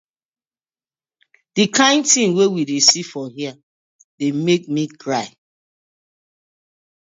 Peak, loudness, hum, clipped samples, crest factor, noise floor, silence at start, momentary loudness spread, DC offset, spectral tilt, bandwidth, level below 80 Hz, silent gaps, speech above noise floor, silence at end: 0 dBFS; -16 LUFS; none; under 0.1%; 20 dB; under -90 dBFS; 1.55 s; 15 LU; under 0.1%; -3 dB/octave; 8 kHz; -70 dBFS; 3.63-4.18 s; over 73 dB; 1.9 s